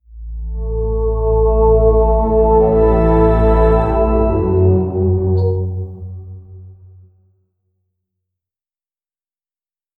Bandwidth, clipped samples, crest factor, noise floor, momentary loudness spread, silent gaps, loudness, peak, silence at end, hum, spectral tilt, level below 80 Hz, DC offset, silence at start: 4.2 kHz; under 0.1%; 14 dB; under -90 dBFS; 17 LU; none; -14 LUFS; -2 dBFS; 3.25 s; none; -11.5 dB/octave; -20 dBFS; under 0.1%; 0.1 s